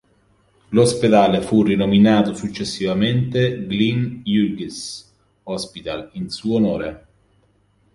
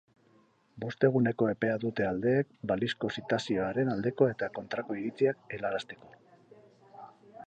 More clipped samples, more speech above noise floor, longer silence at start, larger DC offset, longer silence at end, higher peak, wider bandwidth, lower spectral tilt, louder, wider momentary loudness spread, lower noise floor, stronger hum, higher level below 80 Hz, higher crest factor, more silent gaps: neither; first, 42 dB vs 35 dB; about the same, 0.7 s vs 0.75 s; neither; first, 0.95 s vs 0 s; first, -2 dBFS vs -12 dBFS; first, 11.5 kHz vs 9 kHz; about the same, -6 dB/octave vs -7 dB/octave; first, -19 LUFS vs -31 LUFS; about the same, 15 LU vs 15 LU; second, -60 dBFS vs -65 dBFS; neither; first, -50 dBFS vs -66 dBFS; about the same, 18 dB vs 20 dB; neither